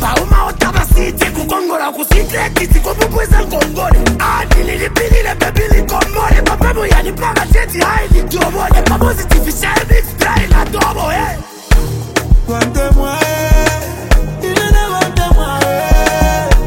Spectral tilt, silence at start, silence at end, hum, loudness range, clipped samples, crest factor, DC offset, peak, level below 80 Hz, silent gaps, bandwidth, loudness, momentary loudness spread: -5 dB/octave; 0 s; 0 s; none; 1 LU; 0.5%; 10 dB; under 0.1%; 0 dBFS; -12 dBFS; none; 17 kHz; -13 LUFS; 3 LU